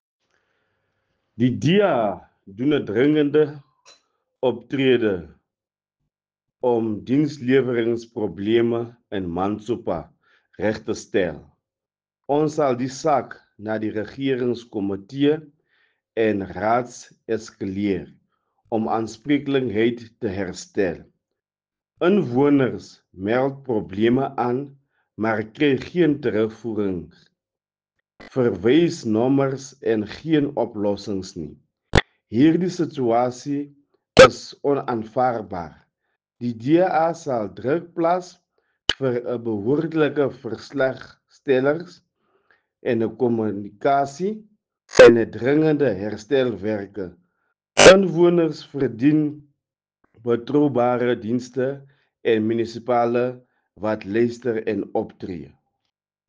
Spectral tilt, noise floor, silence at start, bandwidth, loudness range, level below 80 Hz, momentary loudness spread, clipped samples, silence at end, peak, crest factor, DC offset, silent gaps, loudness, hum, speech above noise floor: -5.5 dB/octave; under -90 dBFS; 1.4 s; 9.6 kHz; 7 LU; -50 dBFS; 12 LU; under 0.1%; 0.8 s; -2 dBFS; 20 dB; under 0.1%; none; -21 LUFS; none; over 69 dB